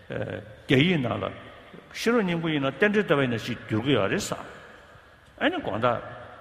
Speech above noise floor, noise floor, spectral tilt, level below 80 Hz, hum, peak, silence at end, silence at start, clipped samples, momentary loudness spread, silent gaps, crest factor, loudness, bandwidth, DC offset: 26 dB; -52 dBFS; -5.5 dB/octave; -56 dBFS; none; -4 dBFS; 0 s; 0.1 s; under 0.1%; 18 LU; none; 22 dB; -26 LUFS; 15 kHz; under 0.1%